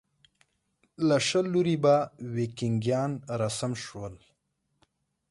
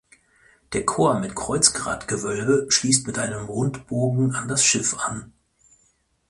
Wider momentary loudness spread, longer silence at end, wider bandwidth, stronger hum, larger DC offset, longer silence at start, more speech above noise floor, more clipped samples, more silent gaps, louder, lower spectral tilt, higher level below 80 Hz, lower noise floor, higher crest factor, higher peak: first, 12 LU vs 9 LU; first, 1.15 s vs 1 s; about the same, 11.5 kHz vs 11.5 kHz; neither; neither; first, 1 s vs 0.7 s; first, 50 dB vs 42 dB; neither; neither; second, -28 LUFS vs -21 LUFS; first, -5.5 dB/octave vs -3.5 dB/octave; second, -64 dBFS vs -52 dBFS; first, -77 dBFS vs -65 dBFS; about the same, 18 dB vs 22 dB; second, -12 dBFS vs 0 dBFS